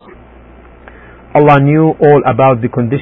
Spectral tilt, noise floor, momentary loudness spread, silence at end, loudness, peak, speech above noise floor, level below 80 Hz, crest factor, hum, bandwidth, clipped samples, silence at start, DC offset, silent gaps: -10.5 dB/octave; -37 dBFS; 7 LU; 0 s; -9 LUFS; 0 dBFS; 29 dB; -40 dBFS; 12 dB; none; 4 kHz; 0.1%; 1.35 s; under 0.1%; none